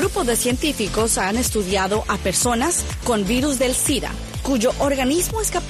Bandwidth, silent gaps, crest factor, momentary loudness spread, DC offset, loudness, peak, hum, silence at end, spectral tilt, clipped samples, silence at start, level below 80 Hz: 14.5 kHz; none; 14 dB; 3 LU; under 0.1%; -20 LUFS; -8 dBFS; none; 0 s; -3.5 dB/octave; under 0.1%; 0 s; -32 dBFS